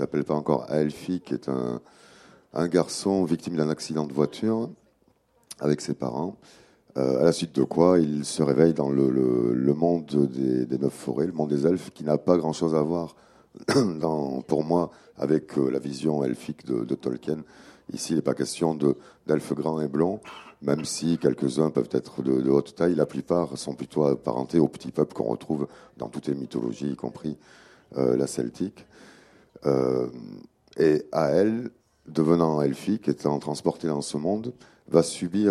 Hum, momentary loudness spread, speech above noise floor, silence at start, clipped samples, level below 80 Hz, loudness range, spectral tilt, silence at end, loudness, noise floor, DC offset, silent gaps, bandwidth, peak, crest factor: none; 11 LU; 40 dB; 0 s; under 0.1%; -60 dBFS; 6 LU; -6.5 dB/octave; 0 s; -26 LUFS; -65 dBFS; under 0.1%; none; 13.5 kHz; -4 dBFS; 22 dB